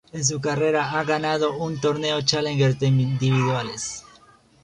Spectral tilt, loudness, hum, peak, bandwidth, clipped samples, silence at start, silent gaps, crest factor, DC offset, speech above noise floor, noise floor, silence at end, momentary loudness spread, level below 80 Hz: -4.5 dB/octave; -22 LUFS; none; -4 dBFS; 10.5 kHz; under 0.1%; 0.15 s; none; 20 dB; under 0.1%; 31 dB; -53 dBFS; 0.6 s; 6 LU; -56 dBFS